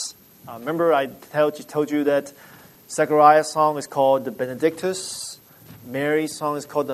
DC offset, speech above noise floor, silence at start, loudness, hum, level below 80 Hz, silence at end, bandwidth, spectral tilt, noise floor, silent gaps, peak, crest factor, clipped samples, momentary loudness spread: under 0.1%; 25 dB; 0 s; -21 LUFS; none; -68 dBFS; 0 s; 13.5 kHz; -4.5 dB/octave; -46 dBFS; none; 0 dBFS; 20 dB; under 0.1%; 17 LU